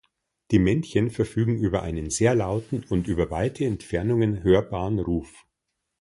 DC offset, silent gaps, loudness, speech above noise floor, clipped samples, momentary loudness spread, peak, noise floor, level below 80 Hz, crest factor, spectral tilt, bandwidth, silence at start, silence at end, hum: under 0.1%; none; -24 LUFS; 57 dB; under 0.1%; 7 LU; -6 dBFS; -81 dBFS; -42 dBFS; 18 dB; -6.5 dB/octave; 11.5 kHz; 0.5 s; 0.75 s; none